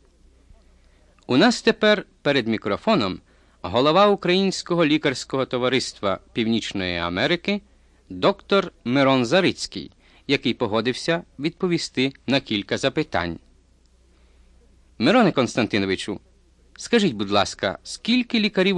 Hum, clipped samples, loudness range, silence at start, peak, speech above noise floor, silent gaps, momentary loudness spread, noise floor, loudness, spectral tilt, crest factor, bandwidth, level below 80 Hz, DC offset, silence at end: none; under 0.1%; 4 LU; 1.3 s; -4 dBFS; 36 dB; none; 11 LU; -57 dBFS; -22 LUFS; -5 dB/octave; 18 dB; 11 kHz; -54 dBFS; under 0.1%; 0 s